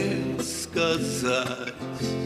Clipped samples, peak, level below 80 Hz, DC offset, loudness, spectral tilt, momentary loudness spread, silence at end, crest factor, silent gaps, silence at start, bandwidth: under 0.1%; -10 dBFS; -54 dBFS; under 0.1%; -27 LUFS; -4 dB/octave; 7 LU; 0 s; 18 dB; none; 0 s; 15.5 kHz